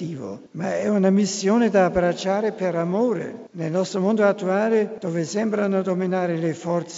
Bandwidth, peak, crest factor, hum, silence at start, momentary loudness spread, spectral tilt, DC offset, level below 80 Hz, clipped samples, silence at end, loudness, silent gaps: 8 kHz; -4 dBFS; 18 dB; none; 0 s; 9 LU; -6 dB/octave; under 0.1%; -56 dBFS; under 0.1%; 0 s; -22 LUFS; none